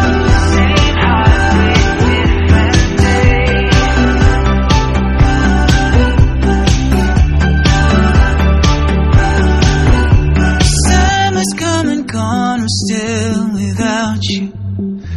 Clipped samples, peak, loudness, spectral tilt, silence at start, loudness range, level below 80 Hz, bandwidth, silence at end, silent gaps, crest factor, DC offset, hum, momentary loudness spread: 0.3%; 0 dBFS; -12 LUFS; -5.5 dB/octave; 0 s; 3 LU; -14 dBFS; 12 kHz; 0 s; none; 10 dB; under 0.1%; none; 5 LU